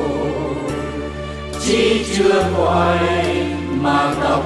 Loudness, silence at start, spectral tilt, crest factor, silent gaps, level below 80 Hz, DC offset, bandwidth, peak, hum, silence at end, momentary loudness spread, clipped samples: -18 LUFS; 0 s; -5 dB/octave; 12 dB; none; -38 dBFS; under 0.1%; 12.5 kHz; -4 dBFS; none; 0 s; 10 LU; under 0.1%